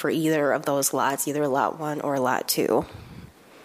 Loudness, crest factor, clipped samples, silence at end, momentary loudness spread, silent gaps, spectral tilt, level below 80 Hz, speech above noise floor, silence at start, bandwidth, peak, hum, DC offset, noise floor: -24 LUFS; 18 dB; under 0.1%; 0 s; 7 LU; none; -4 dB/octave; -58 dBFS; 22 dB; 0 s; 15.5 kHz; -6 dBFS; none; under 0.1%; -46 dBFS